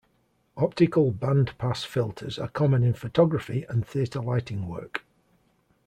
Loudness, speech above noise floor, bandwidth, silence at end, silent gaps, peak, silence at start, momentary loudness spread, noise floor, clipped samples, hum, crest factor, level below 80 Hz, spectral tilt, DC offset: -26 LUFS; 43 dB; 10 kHz; 0.9 s; none; -8 dBFS; 0.55 s; 12 LU; -68 dBFS; under 0.1%; none; 18 dB; -56 dBFS; -8 dB/octave; under 0.1%